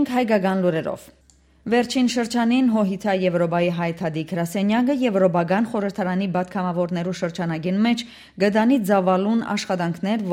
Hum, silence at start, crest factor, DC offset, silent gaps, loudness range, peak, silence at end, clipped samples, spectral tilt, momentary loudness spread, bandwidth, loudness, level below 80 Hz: none; 0 s; 16 dB; under 0.1%; none; 1 LU; -6 dBFS; 0 s; under 0.1%; -6.5 dB/octave; 7 LU; 16 kHz; -21 LUFS; -58 dBFS